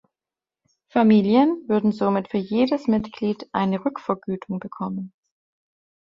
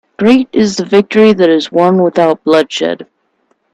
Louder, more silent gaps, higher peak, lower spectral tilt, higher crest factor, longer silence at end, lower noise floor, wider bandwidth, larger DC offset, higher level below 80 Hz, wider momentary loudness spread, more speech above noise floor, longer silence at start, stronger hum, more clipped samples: second, -22 LUFS vs -10 LUFS; neither; second, -4 dBFS vs 0 dBFS; first, -8.5 dB/octave vs -5.5 dB/octave; first, 18 dB vs 10 dB; first, 0.95 s vs 0.7 s; first, under -90 dBFS vs -59 dBFS; second, 5.8 kHz vs 10.5 kHz; neither; second, -60 dBFS vs -52 dBFS; first, 13 LU vs 8 LU; first, over 69 dB vs 50 dB; first, 0.95 s vs 0.2 s; neither; neither